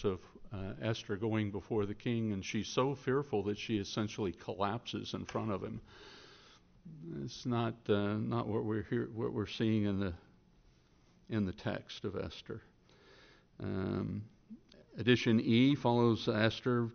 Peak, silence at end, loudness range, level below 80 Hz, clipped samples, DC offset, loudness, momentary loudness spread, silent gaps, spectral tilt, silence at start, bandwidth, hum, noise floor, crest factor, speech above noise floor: -14 dBFS; 0 s; 9 LU; -62 dBFS; under 0.1%; under 0.1%; -35 LUFS; 18 LU; none; -5.5 dB/octave; 0 s; 6.6 kHz; none; -66 dBFS; 22 dB; 31 dB